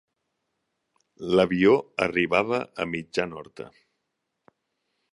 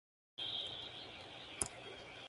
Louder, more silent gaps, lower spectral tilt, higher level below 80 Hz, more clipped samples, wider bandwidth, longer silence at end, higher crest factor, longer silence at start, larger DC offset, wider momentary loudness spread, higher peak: first, -24 LUFS vs -44 LUFS; neither; first, -6 dB/octave vs -1 dB/octave; first, -60 dBFS vs -68 dBFS; neither; about the same, 11 kHz vs 11.5 kHz; first, 1.45 s vs 0 s; second, 22 dB vs 34 dB; first, 1.2 s vs 0.4 s; neither; first, 21 LU vs 10 LU; first, -6 dBFS vs -12 dBFS